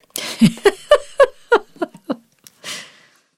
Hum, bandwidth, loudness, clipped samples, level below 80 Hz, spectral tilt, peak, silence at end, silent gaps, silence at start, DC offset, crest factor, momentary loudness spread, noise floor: none; 16.5 kHz; -17 LUFS; under 0.1%; -50 dBFS; -5 dB/octave; 0 dBFS; 0.55 s; none; 0.15 s; under 0.1%; 18 dB; 16 LU; -51 dBFS